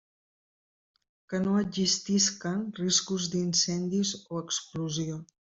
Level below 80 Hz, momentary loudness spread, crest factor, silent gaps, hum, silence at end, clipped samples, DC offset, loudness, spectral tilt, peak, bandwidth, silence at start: -66 dBFS; 8 LU; 18 dB; none; none; 0.15 s; under 0.1%; under 0.1%; -28 LUFS; -3.5 dB/octave; -12 dBFS; 8 kHz; 1.3 s